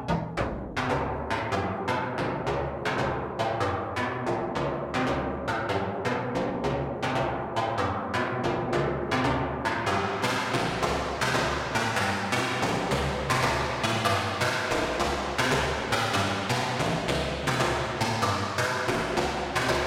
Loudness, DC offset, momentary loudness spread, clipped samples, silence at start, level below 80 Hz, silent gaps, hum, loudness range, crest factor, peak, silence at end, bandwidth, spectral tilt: -28 LUFS; under 0.1%; 4 LU; under 0.1%; 0 s; -44 dBFS; none; none; 3 LU; 18 dB; -10 dBFS; 0 s; 16.5 kHz; -4.5 dB/octave